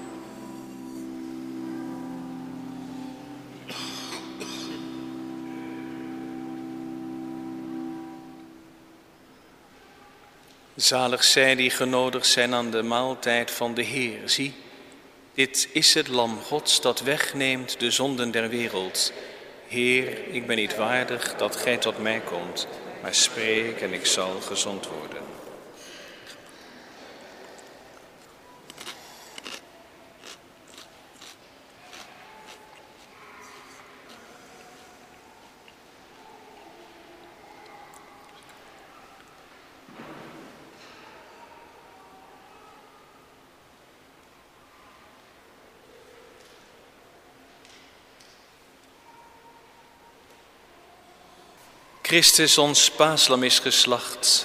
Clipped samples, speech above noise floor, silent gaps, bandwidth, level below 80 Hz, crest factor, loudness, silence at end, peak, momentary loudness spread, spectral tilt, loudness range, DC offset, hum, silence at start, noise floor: under 0.1%; 31 dB; none; 15.5 kHz; -68 dBFS; 28 dB; -23 LUFS; 0 s; -2 dBFS; 28 LU; -1.5 dB/octave; 26 LU; under 0.1%; none; 0 s; -54 dBFS